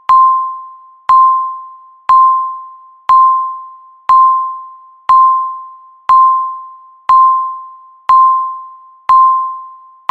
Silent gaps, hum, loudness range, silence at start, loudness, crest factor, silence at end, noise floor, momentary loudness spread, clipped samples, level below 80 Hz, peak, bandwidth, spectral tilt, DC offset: none; none; 0 LU; 0.1 s; -10 LUFS; 12 dB; 0.35 s; -34 dBFS; 20 LU; under 0.1%; -52 dBFS; 0 dBFS; 4.6 kHz; -2 dB/octave; under 0.1%